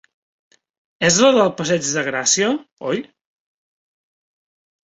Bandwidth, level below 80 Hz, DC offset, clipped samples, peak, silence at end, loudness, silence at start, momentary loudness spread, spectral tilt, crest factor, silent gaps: 8.4 kHz; -62 dBFS; under 0.1%; under 0.1%; -2 dBFS; 1.8 s; -17 LUFS; 1 s; 12 LU; -3 dB/octave; 20 dB; 2.72-2.77 s